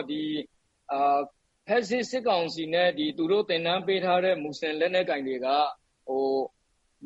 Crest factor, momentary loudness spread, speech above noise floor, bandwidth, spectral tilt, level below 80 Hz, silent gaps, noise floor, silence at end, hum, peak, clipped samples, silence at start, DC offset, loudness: 16 dB; 8 LU; 38 dB; 8.2 kHz; -5 dB/octave; -72 dBFS; none; -65 dBFS; 0 s; none; -12 dBFS; under 0.1%; 0 s; under 0.1%; -27 LUFS